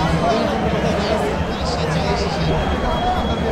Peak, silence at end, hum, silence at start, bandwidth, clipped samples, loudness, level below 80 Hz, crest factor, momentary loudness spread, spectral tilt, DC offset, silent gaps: -6 dBFS; 0 s; none; 0 s; 14 kHz; under 0.1%; -19 LUFS; -28 dBFS; 12 dB; 3 LU; -6 dB/octave; under 0.1%; none